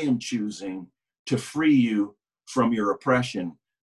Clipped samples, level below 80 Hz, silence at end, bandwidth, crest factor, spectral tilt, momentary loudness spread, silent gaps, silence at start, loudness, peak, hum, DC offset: under 0.1%; -62 dBFS; 0.3 s; 12 kHz; 18 dB; -5.5 dB/octave; 15 LU; 1.19-1.26 s; 0 s; -25 LUFS; -8 dBFS; none; under 0.1%